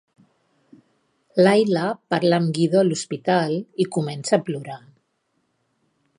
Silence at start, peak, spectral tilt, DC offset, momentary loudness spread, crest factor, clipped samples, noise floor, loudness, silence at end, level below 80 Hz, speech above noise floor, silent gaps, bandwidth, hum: 1.35 s; -2 dBFS; -6 dB/octave; under 0.1%; 11 LU; 20 dB; under 0.1%; -71 dBFS; -21 LUFS; 1.4 s; -72 dBFS; 50 dB; none; 11.5 kHz; none